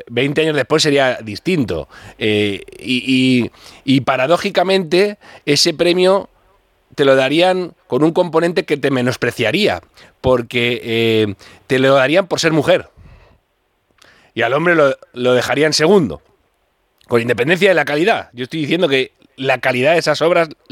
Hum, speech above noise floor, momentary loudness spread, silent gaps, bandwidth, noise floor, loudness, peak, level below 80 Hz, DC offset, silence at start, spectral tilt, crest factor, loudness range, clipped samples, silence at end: none; 49 dB; 9 LU; none; 16.5 kHz; -64 dBFS; -15 LUFS; 0 dBFS; -50 dBFS; under 0.1%; 0 s; -4.5 dB/octave; 16 dB; 2 LU; under 0.1%; 0.2 s